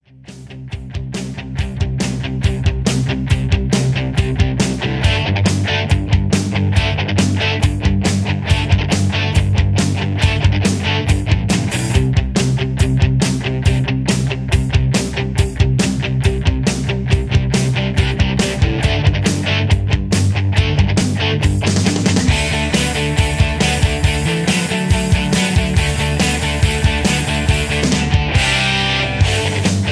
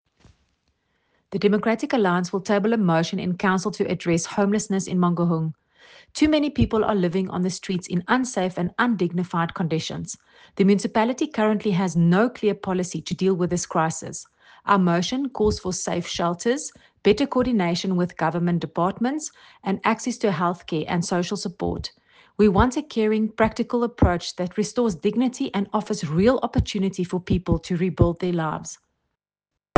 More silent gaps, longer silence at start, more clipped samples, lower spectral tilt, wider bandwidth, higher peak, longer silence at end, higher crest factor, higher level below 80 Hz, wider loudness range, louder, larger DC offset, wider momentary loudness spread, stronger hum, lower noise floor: neither; second, 0.25 s vs 1.3 s; neither; about the same, -5 dB/octave vs -6 dB/octave; first, 11 kHz vs 9.8 kHz; about the same, 0 dBFS vs -2 dBFS; second, 0 s vs 1.05 s; second, 14 dB vs 20 dB; first, -24 dBFS vs -42 dBFS; about the same, 2 LU vs 2 LU; first, -16 LUFS vs -23 LUFS; neither; second, 3 LU vs 8 LU; neither; second, -37 dBFS vs -85 dBFS